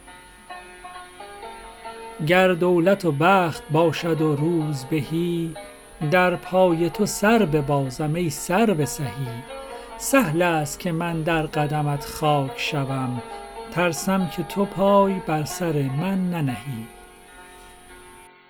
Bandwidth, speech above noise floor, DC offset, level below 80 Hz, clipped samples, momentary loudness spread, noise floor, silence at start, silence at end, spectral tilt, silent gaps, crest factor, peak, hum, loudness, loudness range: 19.5 kHz; 25 dB; under 0.1%; -50 dBFS; under 0.1%; 20 LU; -47 dBFS; 0.05 s; 0.2 s; -5.5 dB/octave; none; 20 dB; -4 dBFS; none; -22 LUFS; 4 LU